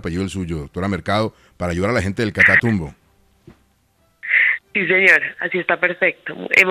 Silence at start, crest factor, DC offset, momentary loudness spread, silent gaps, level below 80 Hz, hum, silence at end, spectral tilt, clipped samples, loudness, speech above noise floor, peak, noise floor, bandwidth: 0.05 s; 20 dB; under 0.1%; 15 LU; none; -48 dBFS; none; 0 s; -5.5 dB/octave; under 0.1%; -17 LUFS; 42 dB; 0 dBFS; -61 dBFS; 14.5 kHz